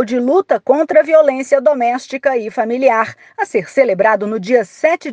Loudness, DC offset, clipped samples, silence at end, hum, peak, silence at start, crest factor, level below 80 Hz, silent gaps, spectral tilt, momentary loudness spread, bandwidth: -14 LUFS; under 0.1%; under 0.1%; 0 s; none; 0 dBFS; 0 s; 14 dB; -66 dBFS; none; -5.5 dB/octave; 7 LU; 9.2 kHz